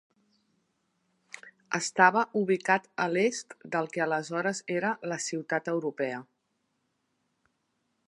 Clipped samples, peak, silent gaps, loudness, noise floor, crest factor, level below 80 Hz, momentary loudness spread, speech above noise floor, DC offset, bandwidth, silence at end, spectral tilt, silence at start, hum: under 0.1%; -6 dBFS; none; -29 LUFS; -78 dBFS; 26 dB; -84 dBFS; 16 LU; 49 dB; under 0.1%; 11.5 kHz; 1.85 s; -4 dB/octave; 1.45 s; none